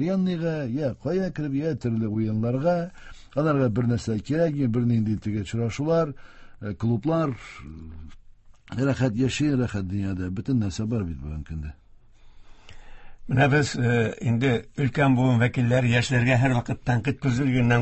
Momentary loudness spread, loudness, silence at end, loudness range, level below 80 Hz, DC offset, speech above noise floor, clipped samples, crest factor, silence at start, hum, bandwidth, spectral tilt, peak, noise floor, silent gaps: 14 LU; -25 LUFS; 0 s; 6 LU; -46 dBFS; under 0.1%; 25 dB; under 0.1%; 18 dB; 0 s; none; 8.4 kHz; -7 dB/octave; -6 dBFS; -49 dBFS; none